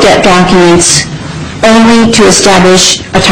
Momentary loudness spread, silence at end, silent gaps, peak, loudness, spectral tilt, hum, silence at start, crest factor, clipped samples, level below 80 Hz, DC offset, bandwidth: 7 LU; 0 s; none; 0 dBFS; -4 LUFS; -3.5 dB/octave; none; 0 s; 4 dB; 2%; -28 dBFS; 3%; 17 kHz